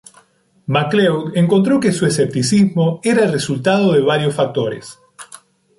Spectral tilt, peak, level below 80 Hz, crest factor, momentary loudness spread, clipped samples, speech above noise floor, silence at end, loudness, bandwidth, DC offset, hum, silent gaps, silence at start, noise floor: -5.5 dB/octave; -4 dBFS; -56 dBFS; 12 dB; 9 LU; under 0.1%; 38 dB; 0.55 s; -15 LUFS; 11.5 kHz; under 0.1%; none; none; 0.7 s; -53 dBFS